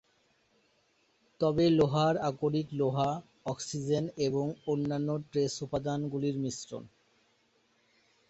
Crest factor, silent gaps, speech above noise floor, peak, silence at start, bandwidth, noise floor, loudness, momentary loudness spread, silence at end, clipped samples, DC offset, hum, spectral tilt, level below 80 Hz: 18 dB; none; 41 dB; -14 dBFS; 1.4 s; 8.2 kHz; -71 dBFS; -31 LUFS; 11 LU; 1.45 s; under 0.1%; under 0.1%; none; -6.5 dB/octave; -64 dBFS